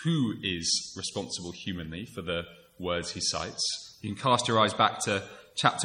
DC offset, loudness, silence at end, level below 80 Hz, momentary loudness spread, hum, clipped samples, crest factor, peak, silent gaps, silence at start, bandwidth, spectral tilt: under 0.1%; -29 LUFS; 0 s; -58 dBFS; 13 LU; none; under 0.1%; 24 dB; -6 dBFS; none; 0 s; 15.5 kHz; -3.5 dB/octave